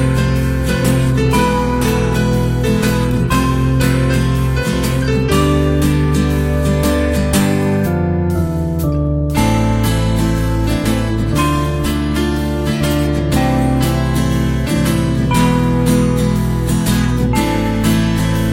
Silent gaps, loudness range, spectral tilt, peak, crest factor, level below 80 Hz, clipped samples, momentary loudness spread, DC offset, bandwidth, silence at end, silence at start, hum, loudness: none; 1 LU; -6 dB/octave; 0 dBFS; 14 dB; -22 dBFS; under 0.1%; 3 LU; under 0.1%; 16.5 kHz; 0 s; 0 s; none; -15 LUFS